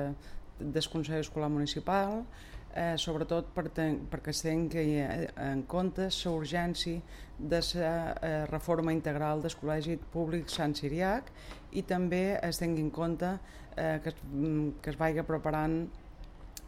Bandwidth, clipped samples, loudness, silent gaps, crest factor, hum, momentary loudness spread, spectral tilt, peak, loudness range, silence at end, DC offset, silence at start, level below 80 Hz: 16 kHz; under 0.1%; -34 LUFS; none; 16 dB; none; 11 LU; -5.5 dB/octave; -16 dBFS; 1 LU; 0 s; under 0.1%; 0 s; -48 dBFS